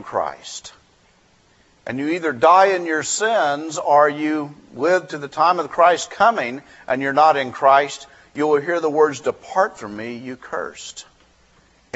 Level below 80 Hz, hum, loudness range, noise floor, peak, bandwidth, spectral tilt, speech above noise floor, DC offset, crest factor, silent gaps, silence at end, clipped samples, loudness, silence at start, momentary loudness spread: -64 dBFS; none; 5 LU; -56 dBFS; -2 dBFS; 8.2 kHz; -3.5 dB/octave; 37 dB; under 0.1%; 18 dB; none; 0.95 s; under 0.1%; -18 LUFS; 0 s; 18 LU